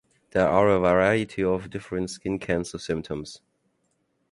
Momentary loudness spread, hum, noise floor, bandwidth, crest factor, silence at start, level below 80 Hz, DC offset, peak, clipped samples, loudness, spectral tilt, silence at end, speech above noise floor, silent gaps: 12 LU; none; -72 dBFS; 11.5 kHz; 20 dB; 0.35 s; -50 dBFS; under 0.1%; -6 dBFS; under 0.1%; -25 LUFS; -6 dB/octave; 0.95 s; 48 dB; none